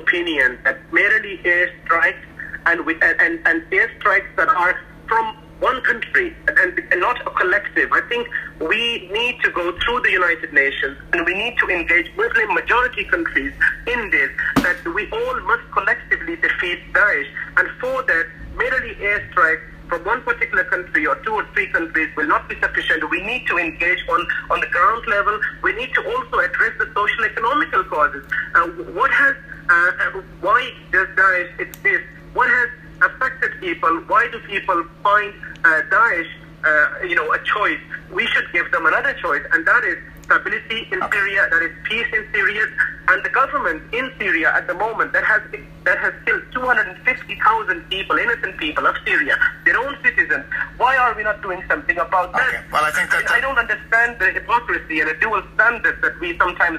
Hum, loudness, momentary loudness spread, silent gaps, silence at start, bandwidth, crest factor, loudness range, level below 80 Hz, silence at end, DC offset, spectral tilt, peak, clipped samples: none; -18 LUFS; 6 LU; none; 0 s; 15.5 kHz; 18 dB; 2 LU; -44 dBFS; 0 s; under 0.1%; -4 dB/octave; 0 dBFS; under 0.1%